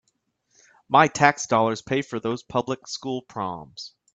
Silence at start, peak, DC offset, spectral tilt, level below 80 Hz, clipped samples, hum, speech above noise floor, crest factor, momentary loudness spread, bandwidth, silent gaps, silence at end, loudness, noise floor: 0.9 s; 0 dBFS; under 0.1%; -4.5 dB/octave; -62 dBFS; under 0.1%; none; 49 dB; 24 dB; 13 LU; 9 kHz; none; 0.25 s; -23 LUFS; -72 dBFS